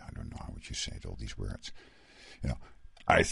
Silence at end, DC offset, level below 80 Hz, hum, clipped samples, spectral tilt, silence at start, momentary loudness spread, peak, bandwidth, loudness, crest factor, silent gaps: 0 s; under 0.1%; -46 dBFS; none; under 0.1%; -4 dB/octave; 0 s; 16 LU; -10 dBFS; 11.5 kHz; -36 LUFS; 26 dB; none